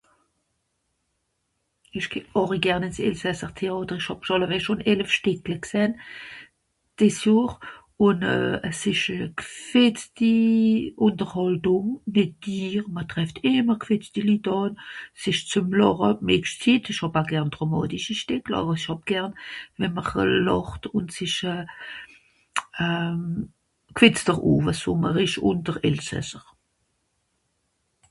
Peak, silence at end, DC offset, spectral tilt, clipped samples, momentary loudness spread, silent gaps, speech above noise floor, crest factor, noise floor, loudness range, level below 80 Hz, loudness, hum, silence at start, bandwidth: 0 dBFS; 1.7 s; under 0.1%; -5.5 dB/octave; under 0.1%; 12 LU; none; 52 dB; 24 dB; -75 dBFS; 5 LU; -52 dBFS; -24 LUFS; none; 1.95 s; 11.5 kHz